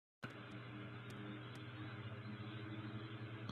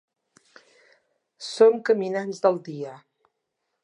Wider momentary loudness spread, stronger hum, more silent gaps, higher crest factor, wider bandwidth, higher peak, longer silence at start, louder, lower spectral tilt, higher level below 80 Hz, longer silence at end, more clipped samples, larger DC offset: second, 3 LU vs 18 LU; neither; neither; about the same, 18 dB vs 22 dB; first, 11.5 kHz vs 10 kHz; second, -32 dBFS vs -4 dBFS; second, 0.2 s vs 1.4 s; second, -51 LUFS vs -22 LUFS; first, -7 dB/octave vs -5 dB/octave; first, -78 dBFS vs -84 dBFS; second, 0 s vs 0.85 s; neither; neither